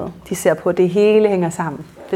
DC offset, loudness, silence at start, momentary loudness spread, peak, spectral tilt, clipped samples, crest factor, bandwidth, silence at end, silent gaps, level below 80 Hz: under 0.1%; -17 LUFS; 0 s; 13 LU; -2 dBFS; -6 dB/octave; under 0.1%; 14 dB; 16 kHz; 0 s; none; -52 dBFS